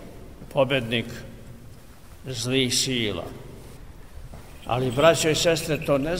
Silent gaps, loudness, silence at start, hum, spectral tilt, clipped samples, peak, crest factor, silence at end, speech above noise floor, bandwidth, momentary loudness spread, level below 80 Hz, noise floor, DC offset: none; -23 LUFS; 0 s; none; -4 dB/octave; under 0.1%; -4 dBFS; 20 dB; 0 s; 23 dB; 16 kHz; 25 LU; -46 dBFS; -46 dBFS; 0.3%